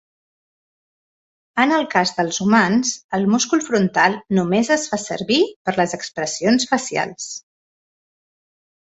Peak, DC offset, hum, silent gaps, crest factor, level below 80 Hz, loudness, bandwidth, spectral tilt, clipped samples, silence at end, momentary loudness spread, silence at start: -2 dBFS; under 0.1%; none; 3.04-3.09 s, 5.56-5.65 s; 18 dB; -60 dBFS; -19 LUFS; 8.2 kHz; -4 dB/octave; under 0.1%; 1.45 s; 9 LU; 1.55 s